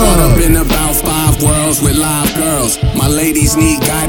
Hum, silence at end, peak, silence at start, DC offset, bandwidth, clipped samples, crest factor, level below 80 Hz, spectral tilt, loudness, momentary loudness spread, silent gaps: none; 0 s; 0 dBFS; 0 s; under 0.1%; 18 kHz; under 0.1%; 10 dB; -18 dBFS; -4.5 dB/octave; -11 LUFS; 3 LU; none